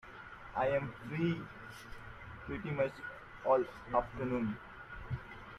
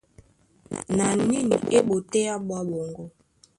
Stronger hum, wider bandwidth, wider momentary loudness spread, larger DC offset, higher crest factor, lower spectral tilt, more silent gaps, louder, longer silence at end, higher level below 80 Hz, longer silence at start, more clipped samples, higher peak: neither; first, 13 kHz vs 11.5 kHz; about the same, 17 LU vs 16 LU; neither; about the same, 20 dB vs 18 dB; first, -8 dB/octave vs -5 dB/octave; neither; second, -37 LUFS vs -24 LUFS; second, 0 s vs 0.5 s; about the same, -58 dBFS vs -58 dBFS; second, 0.05 s vs 0.7 s; neither; second, -18 dBFS vs -8 dBFS